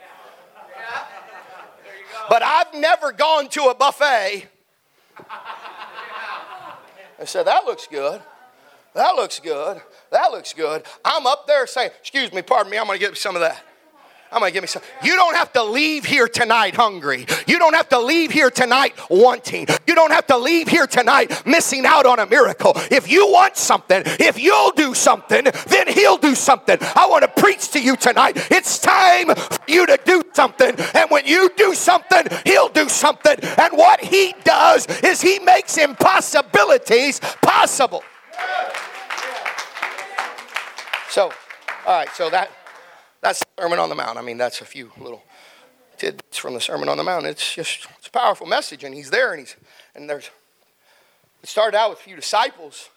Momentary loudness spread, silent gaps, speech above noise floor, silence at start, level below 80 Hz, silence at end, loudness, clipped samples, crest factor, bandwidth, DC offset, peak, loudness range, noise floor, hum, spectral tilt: 16 LU; none; 45 dB; 0.7 s; -74 dBFS; 0.15 s; -16 LUFS; under 0.1%; 18 dB; 17 kHz; under 0.1%; 0 dBFS; 11 LU; -61 dBFS; none; -2 dB/octave